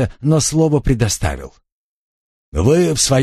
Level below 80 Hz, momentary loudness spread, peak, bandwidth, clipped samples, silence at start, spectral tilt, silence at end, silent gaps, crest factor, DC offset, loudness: -30 dBFS; 10 LU; 0 dBFS; 13 kHz; under 0.1%; 0 s; -5 dB/octave; 0 s; 1.72-2.52 s; 16 dB; under 0.1%; -16 LUFS